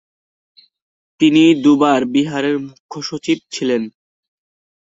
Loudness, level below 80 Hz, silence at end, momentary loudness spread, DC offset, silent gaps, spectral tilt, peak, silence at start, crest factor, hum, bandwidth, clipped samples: -15 LUFS; -62 dBFS; 0.95 s; 15 LU; under 0.1%; 2.80-2.89 s; -5 dB/octave; -2 dBFS; 1.2 s; 16 dB; none; 8 kHz; under 0.1%